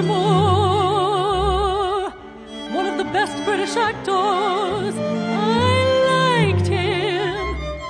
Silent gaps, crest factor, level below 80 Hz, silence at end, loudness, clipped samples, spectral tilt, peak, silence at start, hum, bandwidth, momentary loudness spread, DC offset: none; 14 dB; -38 dBFS; 0 s; -19 LUFS; under 0.1%; -5.5 dB/octave; -6 dBFS; 0 s; none; 10 kHz; 9 LU; under 0.1%